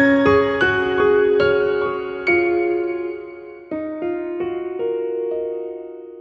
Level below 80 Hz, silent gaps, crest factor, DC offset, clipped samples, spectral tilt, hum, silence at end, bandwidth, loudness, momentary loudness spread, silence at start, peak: -50 dBFS; none; 16 dB; under 0.1%; under 0.1%; -7 dB/octave; none; 0 s; 7 kHz; -19 LUFS; 15 LU; 0 s; -4 dBFS